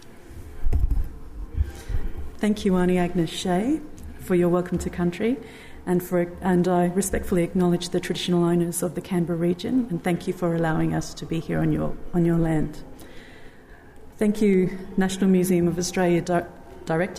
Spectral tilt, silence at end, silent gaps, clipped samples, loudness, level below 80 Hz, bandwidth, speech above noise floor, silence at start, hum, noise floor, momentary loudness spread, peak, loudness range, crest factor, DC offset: -6.5 dB/octave; 0 s; none; under 0.1%; -24 LUFS; -34 dBFS; 15 kHz; 23 dB; 0 s; none; -45 dBFS; 15 LU; -10 dBFS; 3 LU; 14 dB; under 0.1%